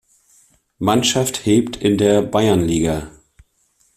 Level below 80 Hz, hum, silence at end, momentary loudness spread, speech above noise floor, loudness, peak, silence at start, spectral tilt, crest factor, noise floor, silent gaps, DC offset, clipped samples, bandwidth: -44 dBFS; none; 0.85 s; 7 LU; 45 dB; -17 LUFS; -2 dBFS; 0.8 s; -5 dB/octave; 16 dB; -61 dBFS; none; under 0.1%; under 0.1%; 15.5 kHz